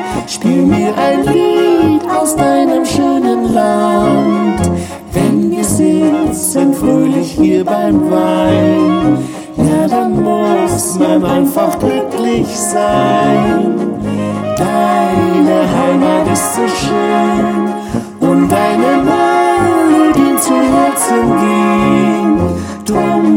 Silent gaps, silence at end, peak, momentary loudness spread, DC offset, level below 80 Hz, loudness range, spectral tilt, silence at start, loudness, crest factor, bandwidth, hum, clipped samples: none; 0 s; 0 dBFS; 5 LU; under 0.1%; -38 dBFS; 2 LU; -5.5 dB/octave; 0 s; -12 LUFS; 10 dB; 17.5 kHz; none; under 0.1%